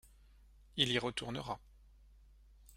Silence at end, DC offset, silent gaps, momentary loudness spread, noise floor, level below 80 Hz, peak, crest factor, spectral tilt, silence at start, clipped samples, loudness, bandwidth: 0 s; under 0.1%; none; 13 LU; -62 dBFS; -62 dBFS; -14 dBFS; 28 dB; -4 dB/octave; 0.05 s; under 0.1%; -37 LUFS; 16 kHz